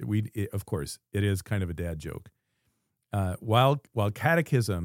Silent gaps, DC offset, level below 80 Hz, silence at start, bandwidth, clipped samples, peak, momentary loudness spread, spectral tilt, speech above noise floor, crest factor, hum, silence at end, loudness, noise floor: none; under 0.1%; -52 dBFS; 0 s; 16.5 kHz; under 0.1%; -6 dBFS; 12 LU; -6 dB/octave; 49 dB; 22 dB; none; 0 s; -28 LUFS; -76 dBFS